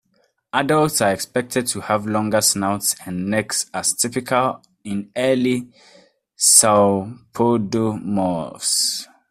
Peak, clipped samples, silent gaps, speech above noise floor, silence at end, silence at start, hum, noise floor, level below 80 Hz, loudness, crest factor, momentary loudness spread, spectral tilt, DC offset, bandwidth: 0 dBFS; under 0.1%; none; 45 dB; 0.25 s; 0.55 s; none; -64 dBFS; -58 dBFS; -19 LUFS; 20 dB; 10 LU; -3 dB/octave; under 0.1%; 16 kHz